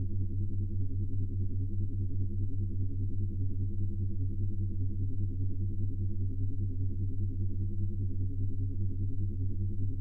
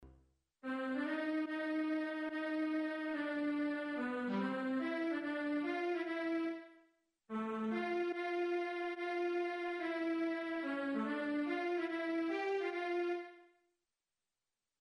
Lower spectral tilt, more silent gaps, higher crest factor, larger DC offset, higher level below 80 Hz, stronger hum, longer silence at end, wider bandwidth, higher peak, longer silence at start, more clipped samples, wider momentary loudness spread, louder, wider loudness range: first, -13.5 dB/octave vs -6 dB/octave; neither; about the same, 10 dB vs 12 dB; neither; first, -36 dBFS vs -78 dBFS; neither; second, 0 s vs 1.35 s; second, 0.6 kHz vs 10.5 kHz; first, -20 dBFS vs -28 dBFS; about the same, 0 s vs 0 s; neither; second, 0 LU vs 3 LU; first, -35 LUFS vs -39 LUFS; about the same, 0 LU vs 2 LU